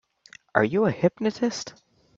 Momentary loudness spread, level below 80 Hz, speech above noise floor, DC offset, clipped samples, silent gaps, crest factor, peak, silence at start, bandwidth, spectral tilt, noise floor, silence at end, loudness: 10 LU; -64 dBFS; 29 dB; under 0.1%; under 0.1%; none; 24 dB; -2 dBFS; 0.55 s; 7.8 kHz; -5.5 dB/octave; -53 dBFS; 0.5 s; -25 LUFS